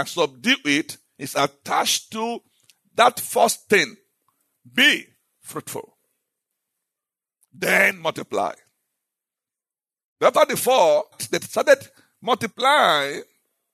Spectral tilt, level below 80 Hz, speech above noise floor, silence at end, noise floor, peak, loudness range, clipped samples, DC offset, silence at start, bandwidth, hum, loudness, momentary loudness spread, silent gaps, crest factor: -2 dB/octave; -76 dBFS; over 69 dB; 0.5 s; under -90 dBFS; -4 dBFS; 5 LU; under 0.1%; under 0.1%; 0 s; 13.5 kHz; none; -20 LUFS; 16 LU; 10.04-10.16 s; 20 dB